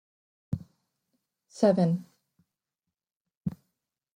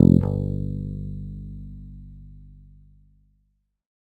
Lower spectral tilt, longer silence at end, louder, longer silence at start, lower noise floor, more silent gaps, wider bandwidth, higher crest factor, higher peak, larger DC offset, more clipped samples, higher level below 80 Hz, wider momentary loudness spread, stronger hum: second, -8 dB/octave vs -12 dB/octave; second, 0.6 s vs 1.45 s; second, -29 LUFS vs -26 LUFS; first, 0.5 s vs 0 s; first, -89 dBFS vs -70 dBFS; first, 3.16-3.25 s, 3.37-3.41 s vs none; first, 10.5 kHz vs 4.4 kHz; about the same, 22 dB vs 24 dB; second, -10 dBFS vs 0 dBFS; neither; neither; second, -64 dBFS vs -40 dBFS; second, 15 LU vs 25 LU; second, none vs 50 Hz at -55 dBFS